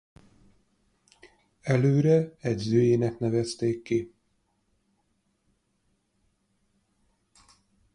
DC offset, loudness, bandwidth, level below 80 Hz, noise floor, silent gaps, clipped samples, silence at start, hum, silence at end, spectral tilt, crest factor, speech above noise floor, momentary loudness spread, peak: under 0.1%; -25 LUFS; 10.5 kHz; -62 dBFS; -73 dBFS; none; under 0.1%; 1.65 s; none; 3.85 s; -7.5 dB/octave; 20 dB; 49 dB; 9 LU; -10 dBFS